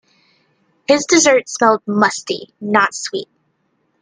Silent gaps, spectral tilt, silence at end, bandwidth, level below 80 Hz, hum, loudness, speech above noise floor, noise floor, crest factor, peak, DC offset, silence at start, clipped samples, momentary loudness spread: none; -2.5 dB/octave; 0.75 s; 10.5 kHz; -62 dBFS; none; -15 LUFS; 50 dB; -65 dBFS; 18 dB; 0 dBFS; under 0.1%; 0.9 s; under 0.1%; 14 LU